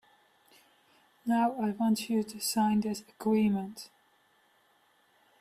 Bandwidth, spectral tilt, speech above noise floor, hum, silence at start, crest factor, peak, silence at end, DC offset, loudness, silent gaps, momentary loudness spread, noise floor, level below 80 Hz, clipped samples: 15.5 kHz; -5 dB/octave; 38 dB; none; 1.25 s; 16 dB; -16 dBFS; 1.55 s; under 0.1%; -30 LUFS; none; 13 LU; -68 dBFS; -70 dBFS; under 0.1%